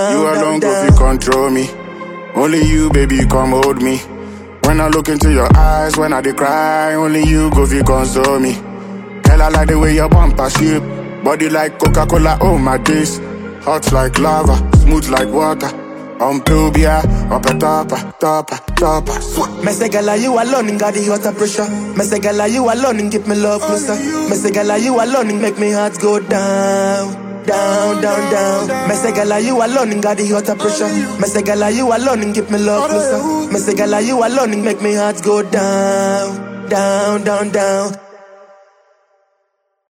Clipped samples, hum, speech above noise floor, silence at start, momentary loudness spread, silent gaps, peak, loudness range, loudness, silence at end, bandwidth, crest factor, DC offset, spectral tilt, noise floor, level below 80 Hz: under 0.1%; none; 54 dB; 0 s; 7 LU; none; 0 dBFS; 3 LU; -14 LUFS; 1.65 s; 16.5 kHz; 12 dB; under 0.1%; -5.5 dB/octave; -66 dBFS; -20 dBFS